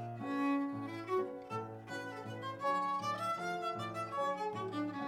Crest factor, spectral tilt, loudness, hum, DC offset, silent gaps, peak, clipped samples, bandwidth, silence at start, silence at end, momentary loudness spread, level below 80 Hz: 14 dB; -6 dB/octave; -38 LUFS; none; under 0.1%; none; -24 dBFS; under 0.1%; 15.5 kHz; 0 s; 0 s; 9 LU; -78 dBFS